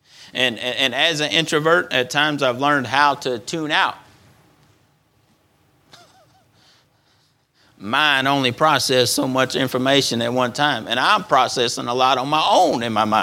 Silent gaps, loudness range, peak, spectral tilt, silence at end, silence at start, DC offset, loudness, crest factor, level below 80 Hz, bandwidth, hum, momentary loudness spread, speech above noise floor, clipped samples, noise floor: none; 9 LU; 0 dBFS; -3 dB/octave; 0 s; 0.2 s; under 0.1%; -18 LUFS; 20 dB; -64 dBFS; 18.5 kHz; none; 5 LU; 42 dB; under 0.1%; -61 dBFS